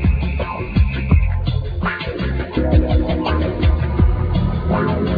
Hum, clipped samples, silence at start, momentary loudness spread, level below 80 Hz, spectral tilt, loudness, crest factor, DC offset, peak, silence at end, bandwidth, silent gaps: none; under 0.1%; 0 s; 6 LU; -20 dBFS; -10 dB/octave; -19 LUFS; 16 dB; under 0.1%; -2 dBFS; 0 s; 5 kHz; none